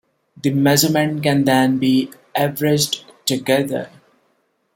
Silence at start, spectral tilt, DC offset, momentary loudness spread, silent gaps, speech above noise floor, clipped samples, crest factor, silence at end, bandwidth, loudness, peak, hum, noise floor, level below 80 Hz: 0.45 s; -4.5 dB/octave; under 0.1%; 10 LU; none; 48 dB; under 0.1%; 18 dB; 0.9 s; 16.5 kHz; -18 LUFS; -2 dBFS; none; -65 dBFS; -58 dBFS